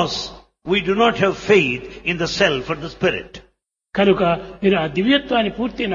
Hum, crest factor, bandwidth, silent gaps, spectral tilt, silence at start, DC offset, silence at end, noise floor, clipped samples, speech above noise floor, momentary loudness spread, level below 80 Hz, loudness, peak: none; 18 dB; 7.4 kHz; none; -5 dB/octave; 0 s; under 0.1%; 0 s; -61 dBFS; under 0.1%; 42 dB; 11 LU; -46 dBFS; -19 LUFS; -2 dBFS